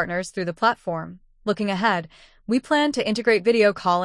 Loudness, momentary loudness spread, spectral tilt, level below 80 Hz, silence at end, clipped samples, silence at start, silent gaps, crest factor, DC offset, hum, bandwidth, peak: -22 LUFS; 12 LU; -5 dB/octave; -58 dBFS; 0 s; under 0.1%; 0 s; none; 16 dB; under 0.1%; none; 12 kHz; -6 dBFS